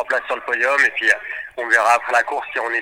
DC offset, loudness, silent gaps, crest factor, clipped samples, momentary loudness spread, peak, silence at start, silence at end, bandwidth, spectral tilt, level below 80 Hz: under 0.1%; -17 LUFS; none; 18 dB; under 0.1%; 8 LU; 0 dBFS; 0 s; 0 s; 17 kHz; -0.5 dB/octave; -62 dBFS